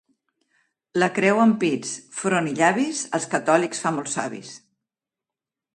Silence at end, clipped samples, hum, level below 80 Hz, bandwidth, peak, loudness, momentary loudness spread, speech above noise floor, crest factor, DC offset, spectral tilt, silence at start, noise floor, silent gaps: 1.2 s; under 0.1%; none; -70 dBFS; 11.5 kHz; -2 dBFS; -22 LUFS; 11 LU; 67 dB; 20 dB; under 0.1%; -4.5 dB/octave; 0.95 s; -89 dBFS; none